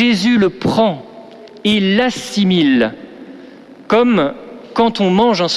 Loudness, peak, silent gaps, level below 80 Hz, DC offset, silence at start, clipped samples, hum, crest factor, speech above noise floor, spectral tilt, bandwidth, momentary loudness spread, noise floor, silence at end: -14 LUFS; -2 dBFS; none; -48 dBFS; under 0.1%; 0 s; under 0.1%; none; 12 dB; 24 dB; -5.5 dB/octave; 12.5 kHz; 14 LU; -38 dBFS; 0 s